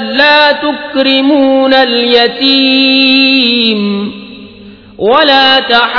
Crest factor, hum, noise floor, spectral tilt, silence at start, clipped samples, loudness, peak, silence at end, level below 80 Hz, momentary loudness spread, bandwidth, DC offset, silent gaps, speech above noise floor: 8 dB; none; -33 dBFS; -5.5 dB/octave; 0 s; 1%; -7 LUFS; 0 dBFS; 0 s; -48 dBFS; 9 LU; 5.4 kHz; under 0.1%; none; 25 dB